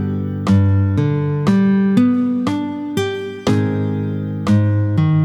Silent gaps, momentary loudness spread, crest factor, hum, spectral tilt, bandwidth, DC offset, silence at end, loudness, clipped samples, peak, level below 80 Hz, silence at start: none; 8 LU; 14 dB; none; -8 dB/octave; 10.5 kHz; under 0.1%; 0 s; -17 LUFS; under 0.1%; -2 dBFS; -48 dBFS; 0 s